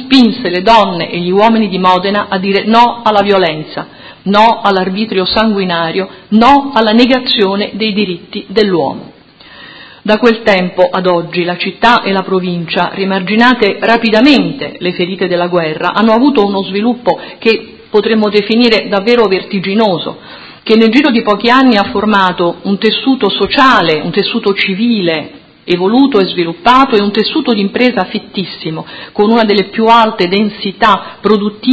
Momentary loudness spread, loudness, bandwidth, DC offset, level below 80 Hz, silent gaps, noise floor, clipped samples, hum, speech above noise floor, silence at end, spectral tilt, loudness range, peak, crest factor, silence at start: 10 LU; -10 LUFS; 8 kHz; under 0.1%; -46 dBFS; none; -37 dBFS; 0.8%; none; 27 dB; 0 s; -6.5 dB/octave; 2 LU; 0 dBFS; 10 dB; 0 s